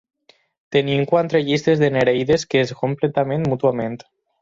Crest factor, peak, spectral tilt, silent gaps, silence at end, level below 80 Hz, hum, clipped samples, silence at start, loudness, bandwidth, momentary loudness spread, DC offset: 16 dB; -4 dBFS; -6 dB/octave; none; 0.45 s; -54 dBFS; none; under 0.1%; 0.7 s; -19 LUFS; 7.6 kHz; 5 LU; under 0.1%